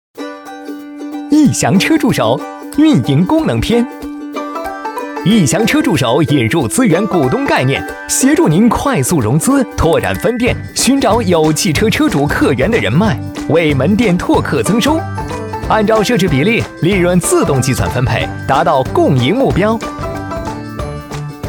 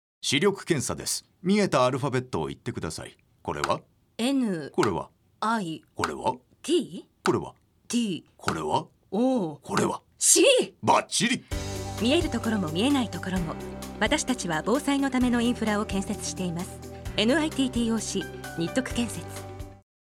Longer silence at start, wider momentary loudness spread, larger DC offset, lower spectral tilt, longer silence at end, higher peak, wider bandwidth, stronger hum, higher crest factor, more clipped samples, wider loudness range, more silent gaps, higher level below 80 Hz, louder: about the same, 0.15 s vs 0.25 s; about the same, 11 LU vs 12 LU; neither; first, -5 dB/octave vs -3.5 dB/octave; second, 0 s vs 0.3 s; first, 0 dBFS vs -6 dBFS; about the same, 19 kHz vs 17.5 kHz; neither; second, 12 dB vs 22 dB; neither; second, 2 LU vs 6 LU; neither; first, -32 dBFS vs -48 dBFS; first, -13 LUFS vs -26 LUFS